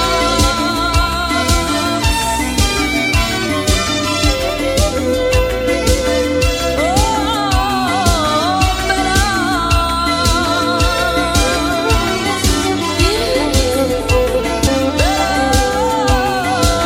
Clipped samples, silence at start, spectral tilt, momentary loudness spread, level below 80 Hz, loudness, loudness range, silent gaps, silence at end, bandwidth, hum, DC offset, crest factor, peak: under 0.1%; 0 s; -4 dB/octave; 2 LU; -22 dBFS; -14 LUFS; 1 LU; none; 0 s; 19 kHz; none; under 0.1%; 14 dB; 0 dBFS